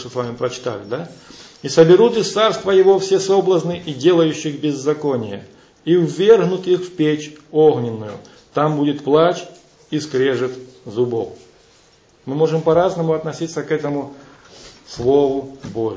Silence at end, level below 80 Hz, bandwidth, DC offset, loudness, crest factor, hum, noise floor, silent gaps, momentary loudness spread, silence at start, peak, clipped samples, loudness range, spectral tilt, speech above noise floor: 0 s; -56 dBFS; 8 kHz; under 0.1%; -17 LUFS; 18 dB; none; -52 dBFS; none; 16 LU; 0 s; 0 dBFS; under 0.1%; 6 LU; -6 dB/octave; 35 dB